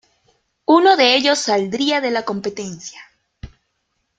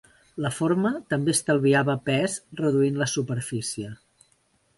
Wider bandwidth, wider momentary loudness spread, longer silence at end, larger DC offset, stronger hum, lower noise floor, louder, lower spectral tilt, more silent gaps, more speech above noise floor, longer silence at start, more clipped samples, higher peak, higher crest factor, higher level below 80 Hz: second, 9.2 kHz vs 12 kHz; first, 18 LU vs 10 LU; about the same, 0.75 s vs 0.85 s; neither; neither; first, -71 dBFS vs -66 dBFS; first, -16 LUFS vs -25 LUFS; second, -3 dB/octave vs -5 dB/octave; neither; first, 54 dB vs 42 dB; first, 0.7 s vs 0.35 s; neither; first, 0 dBFS vs -10 dBFS; about the same, 18 dB vs 16 dB; first, -52 dBFS vs -62 dBFS